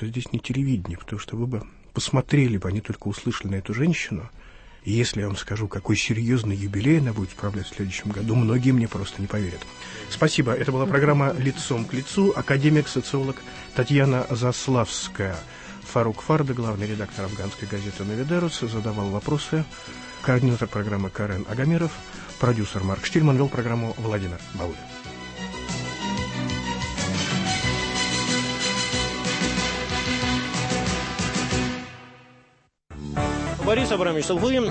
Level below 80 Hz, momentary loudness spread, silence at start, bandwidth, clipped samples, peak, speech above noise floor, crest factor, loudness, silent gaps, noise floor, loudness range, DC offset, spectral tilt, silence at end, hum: -44 dBFS; 12 LU; 0 s; 8.8 kHz; under 0.1%; -8 dBFS; 36 dB; 16 dB; -24 LUFS; none; -60 dBFS; 5 LU; under 0.1%; -5.5 dB/octave; 0 s; none